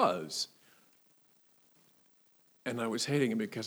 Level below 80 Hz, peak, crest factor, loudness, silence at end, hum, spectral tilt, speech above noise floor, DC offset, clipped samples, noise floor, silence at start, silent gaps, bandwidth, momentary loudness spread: -90 dBFS; -14 dBFS; 22 dB; -34 LUFS; 0 s; none; -4.5 dB/octave; 33 dB; under 0.1%; under 0.1%; -67 dBFS; 0 s; none; over 20 kHz; 9 LU